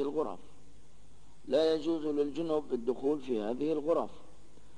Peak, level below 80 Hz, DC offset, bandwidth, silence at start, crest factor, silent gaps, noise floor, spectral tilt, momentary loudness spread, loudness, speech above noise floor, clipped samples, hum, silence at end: -18 dBFS; -64 dBFS; 0.7%; 10.5 kHz; 0 s; 16 dB; none; -60 dBFS; -6.5 dB/octave; 9 LU; -33 LUFS; 28 dB; under 0.1%; 50 Hz at -70 dBFS; 0.5 s